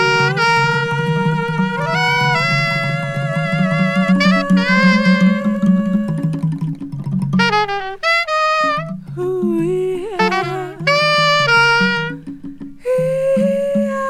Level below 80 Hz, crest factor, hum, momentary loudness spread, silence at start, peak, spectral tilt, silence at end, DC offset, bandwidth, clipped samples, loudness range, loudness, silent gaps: -50 dBFS; 14 dB; none; 10 LU; 0 s; -2 dBFS; -6 dB/octave; 0 s; under 0.1%; 12.5 kHz; under 0.1%; 3 LU; -15 LUFS; none